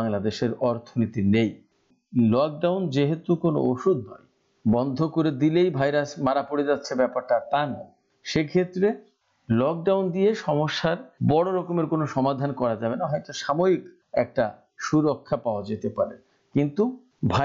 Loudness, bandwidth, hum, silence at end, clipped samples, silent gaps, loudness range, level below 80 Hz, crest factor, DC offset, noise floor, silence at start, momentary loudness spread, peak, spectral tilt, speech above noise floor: -25 LUFS; 7.6 kHz; none; 0 s; under 0.1%; none; 2 LU; -60 dBFS; 12 dB; under 0.1%; -54 dBFS; 0 s; 7 LU; -12 dBFS; -7 dB/octave; 30 dB